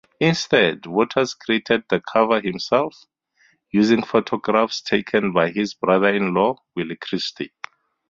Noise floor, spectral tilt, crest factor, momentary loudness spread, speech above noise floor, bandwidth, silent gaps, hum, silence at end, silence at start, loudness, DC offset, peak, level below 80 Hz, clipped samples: -61 dBFS; -5 dB/octave; 20 dB; 11 LU; 41 dB; 7.6 kHz; none; none; 0.65 s; 0.2 s; -20 LUFS; under 0.1%; -2 dBFS; -60 dBFS; under 0.1%